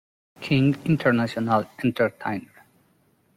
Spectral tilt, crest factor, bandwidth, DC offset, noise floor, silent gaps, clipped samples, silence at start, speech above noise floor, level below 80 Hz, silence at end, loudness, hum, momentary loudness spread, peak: -7.5 dB/octave; 18 dB; 14.5 kHz; under 0.1%; -64 dBFS; none; under 0.1%; 0.4 s; 41 dB; -58 dBFS; 0.9 s; -23 LUFS; none; 10 LU; -6 dBFS